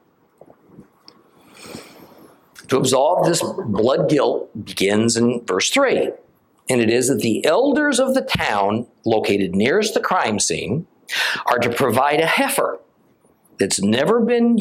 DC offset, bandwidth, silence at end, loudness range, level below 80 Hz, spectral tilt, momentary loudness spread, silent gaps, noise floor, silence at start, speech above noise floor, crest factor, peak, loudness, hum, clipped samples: under 0.1%; 16.5 kHz; 0 s; 3 LU; -56 dBFS; -4 dB/octave; 9 LU; none; -57 dBFS; 0.8 s; 39 dB; 16 dB; -4 dBFS; -18 LUFS; none; under 0.1%